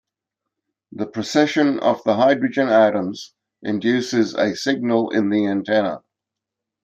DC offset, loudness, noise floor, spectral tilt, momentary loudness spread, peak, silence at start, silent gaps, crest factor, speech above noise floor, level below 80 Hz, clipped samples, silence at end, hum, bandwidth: under 0.1%; -19 LUFS; -84 dBFS; -5.5 dB/octave; 12 LU; -2 dBFS; 0.95 s; none; 18 dB; 65 dB; -68 dBFS; under 0.1%; 0.85 s; none; 8.8 kHz